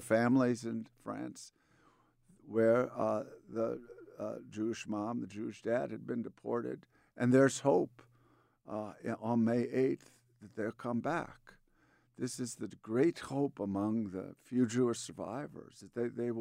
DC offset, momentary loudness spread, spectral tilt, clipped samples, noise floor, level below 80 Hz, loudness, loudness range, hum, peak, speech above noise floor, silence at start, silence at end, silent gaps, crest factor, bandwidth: under 0.1%; 15 LU; -6 dB/octave; under 0.1%; -70 dBFS; -74 dBFS; -35 LUFS; 5 LU; none; -16 dBFS; 36 dB; 0 s; 0 s; none; 20 dB; 15.5 kHz